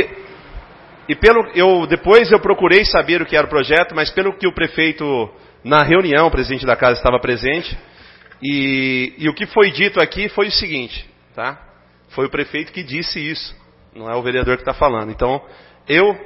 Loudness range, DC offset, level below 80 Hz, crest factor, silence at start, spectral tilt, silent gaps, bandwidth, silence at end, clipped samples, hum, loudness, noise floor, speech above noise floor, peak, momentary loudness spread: 9 LU; under 0.1%; -36 dBFS; 16 dB; 0 s; -7 dB/octave; none; 6.8 kHz; 0 s; under 0.1%; 60 Hz at -50 dBFS; -15 LUFS; -44 dBFS; 28 dB; 0 dBFS; 15 LU